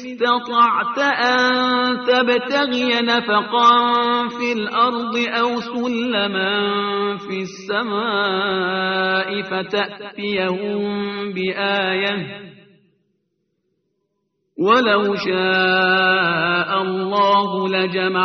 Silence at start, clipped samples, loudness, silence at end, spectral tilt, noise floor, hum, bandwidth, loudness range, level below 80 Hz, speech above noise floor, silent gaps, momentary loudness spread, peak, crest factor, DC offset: 0 s; under 0.1%; -18 LUFS; 0 s; -1.5 dB/octave; -72 dBFS; none; 6.6 kHz; 6 LU; -64 dBFS; 53 dB; none; 8 LU; -2 dBFS; 18 dB; under 0.1%